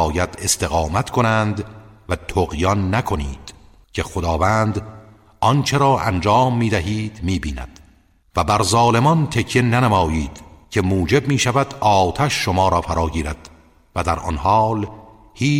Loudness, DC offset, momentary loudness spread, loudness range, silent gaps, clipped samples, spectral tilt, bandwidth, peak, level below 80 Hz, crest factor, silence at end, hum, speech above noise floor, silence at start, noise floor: -19 LUFS; under 0.1%; 13 LU; 4 LU; none; under 0.1%; -5 dB/octave; 16 kHz; -4 dBFS; -34 dBFS; 16 dB; 0 s; none; 36 dB; 0 s; -54 dBFS